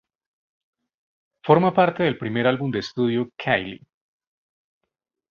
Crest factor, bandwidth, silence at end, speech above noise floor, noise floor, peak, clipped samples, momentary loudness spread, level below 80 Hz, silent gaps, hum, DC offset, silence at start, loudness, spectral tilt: 22 dB; 7.2 kHz; 1.55 s; 61 dB; -82 dBFS; -2 dBFS; under 0.1%; 8 LU; -62 dBFS; none; none; under 0.1%; 1.45 s; -21 LUFS; -7.5 dB/octave